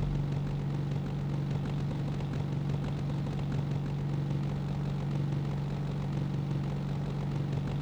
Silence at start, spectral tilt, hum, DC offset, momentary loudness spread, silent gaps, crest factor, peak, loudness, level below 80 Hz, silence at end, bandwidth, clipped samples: 0 s; -8.5 dB/octave; none; under 0.1%; 1 LU; none; 10 dB; -22 dBFS; -33 LUFS; -46 dBFS; 0 s; 7.6 kHz; under 0.1%